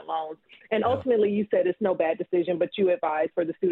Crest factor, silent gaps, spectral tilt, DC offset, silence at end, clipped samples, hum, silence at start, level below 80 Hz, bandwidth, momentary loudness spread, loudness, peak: 14 dB; none; -9 dB/octave; under 0.1%; 0 s; under 0.1%; none; 0 s; -68 dBFS; 4.1 kHz; 8 LU; -25 LUFS; -10 dBFS